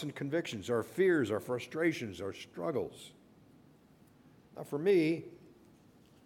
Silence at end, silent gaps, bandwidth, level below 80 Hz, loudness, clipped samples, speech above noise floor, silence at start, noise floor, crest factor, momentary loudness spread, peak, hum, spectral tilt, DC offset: 0.8 s; none; 16.5 kHz; -74 dBFS; -34 LUFS; under 0.1%; 29 dB; 0 s; -62 dBFS; 18 dB; 20 LU; -18 dBFS; none; -6 dB/octave; under 0.1%